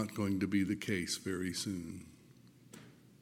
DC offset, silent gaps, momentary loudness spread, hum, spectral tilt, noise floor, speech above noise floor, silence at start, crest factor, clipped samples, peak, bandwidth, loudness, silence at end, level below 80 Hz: under 0.1%; none; 22 LU; none; -4.5 dB/octave; -61 dBFS; 24 dB; 0 s; 18 dB; under 0.1%; -20 dBFS; 17 kHz; -36 LUFS; 0.25 s; -70 dBFS